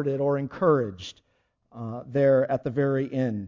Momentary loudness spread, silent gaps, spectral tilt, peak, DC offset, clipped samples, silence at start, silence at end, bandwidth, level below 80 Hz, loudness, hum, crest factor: 16 LU; none; -8 dB/octave; -10 dBFS; under 0.1%; under 0.1%; 0 s; 0 s; 7.4 kHz; -60 dBFS; -25 LUFS; none; 16 dB